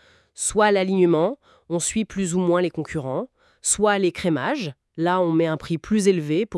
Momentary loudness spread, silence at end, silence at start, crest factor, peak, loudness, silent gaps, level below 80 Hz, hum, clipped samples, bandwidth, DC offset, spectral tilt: 10 LU; 0 s; 0.4 s; 18 dB; -4 dBFS; -22 LUFS; none; -52 dBFS; none; under 0.1%; 12 kHz; under 0.1%; -4.5 dB/octave